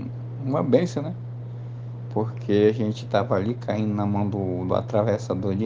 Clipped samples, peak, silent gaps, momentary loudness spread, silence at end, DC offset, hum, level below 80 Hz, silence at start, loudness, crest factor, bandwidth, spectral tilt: under 0.1%; -4 dBFS; none; 14 LU; 0 s; under 0.1%; none; -62 dBFS; 0 s; -25 LUFS; 20 dB; 7.6 kHz; -8 dB/octave